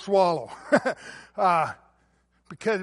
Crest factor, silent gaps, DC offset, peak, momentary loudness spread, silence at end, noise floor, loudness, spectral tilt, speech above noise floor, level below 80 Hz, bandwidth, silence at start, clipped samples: 20 dB; none; under 0.1%; -6 dBFS; 16 LU; 0 s; -66 dBFS; -25 LUFS; -5.5 dB/octave; 41 dB; -68 dBFS; 11.5 kHz; 0 s; under 0.1%